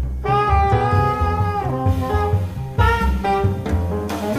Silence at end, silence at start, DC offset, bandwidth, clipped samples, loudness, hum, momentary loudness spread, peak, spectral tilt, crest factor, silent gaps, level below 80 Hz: 0 s; 0 s; under 0.1%; 15.5 kHz; under 0.1%; -19 LUFS; none; 6 LU; -4 dBFS; -7.5 dB/octave; 14 dB; none; -26 dBFS